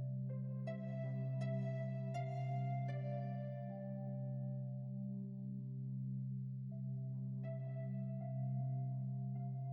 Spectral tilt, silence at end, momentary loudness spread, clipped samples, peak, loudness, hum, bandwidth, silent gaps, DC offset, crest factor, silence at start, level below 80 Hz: -10.5 dB/octave; 0 s; 5 LU; under 0.1%; -32 dBFS; -44 LUFS; none; 4.2 kHz; none; under 0.1%; 10 dB; 0 s; -82 dBFS